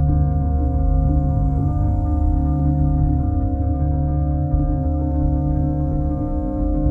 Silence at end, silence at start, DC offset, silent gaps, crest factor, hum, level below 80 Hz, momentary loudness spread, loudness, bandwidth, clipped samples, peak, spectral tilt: 0 s; 0 s; under 0.1%; none; 12 dB; none; -20 dBFS; 3 LU; -20 LUFS; 1.7 kHz; under 0.1%; -6 dBFS; -13.5 dB/octave